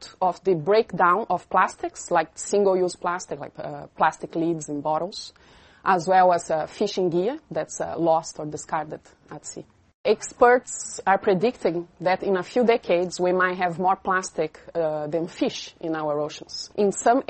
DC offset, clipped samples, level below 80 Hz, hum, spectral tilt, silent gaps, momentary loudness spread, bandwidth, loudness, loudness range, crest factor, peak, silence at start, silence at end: under 0.1%; under 0.1%; -62 dBFS; none; -4.5 dB/octave; 9.94-10.04 s; 14 LU; 8.8 kHz; -24 LUFS; 4 LU; 20 dB; -4 dBFS; 0 s; 0.1 s